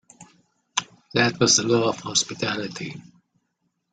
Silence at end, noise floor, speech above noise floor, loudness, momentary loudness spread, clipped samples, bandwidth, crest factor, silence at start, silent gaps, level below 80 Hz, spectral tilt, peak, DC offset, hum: 0.9 s; -74 dBFS; 52 dB; -22 LUFS; 16 LU; under 0.1%; 10 kHz; 24 dB; 0.2 s; none; -64 dBFS; -2.5 dB/octave; -2 dBFS; under 0.1%; none